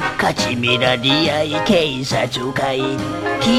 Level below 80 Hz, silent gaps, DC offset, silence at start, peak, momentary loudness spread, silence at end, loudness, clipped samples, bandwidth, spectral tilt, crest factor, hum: -44 dBFS; none; under 0.1%; 0 s; 0 dBFS; 6 LU; 0 s; -17 LUFS; under 0.1%; 15.5 kHz; -4.5 dB/octave; 16 dB; none